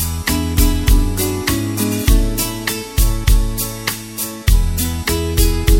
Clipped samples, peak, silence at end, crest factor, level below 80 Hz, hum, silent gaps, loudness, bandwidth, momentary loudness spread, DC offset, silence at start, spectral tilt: under 0.1%; 0 dBFS; 0 s; 14 dB; -18 dBFS; none; none; -18 LUFS; 17 kHz; 5 LU; under 0.1%; 0 s; -4.5 dB/octave